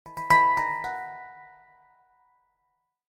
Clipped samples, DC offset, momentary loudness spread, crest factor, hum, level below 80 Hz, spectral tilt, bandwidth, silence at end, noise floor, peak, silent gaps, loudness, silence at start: under 0.1%; under 0.1%; 23 LU; 20 dB; none; -58 dBFS; -3.5 dB/octave; 16 kHz; 1.75 s; -77 dBFS; -8 dBFS; none; -23 LUFS; 0.05 s